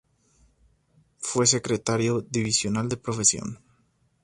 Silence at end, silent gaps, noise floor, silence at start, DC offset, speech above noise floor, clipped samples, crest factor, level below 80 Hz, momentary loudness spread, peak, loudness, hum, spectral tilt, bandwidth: 0.7 s; none; -67 dBFS; 1.2 s; under 0.1%; 42 dB; under 0.1%; 22 dB; -56 dBFS; 12 LU; -6 dBFS; -24 LUFS; none; -3.5 dB/octave; 11.5 kHz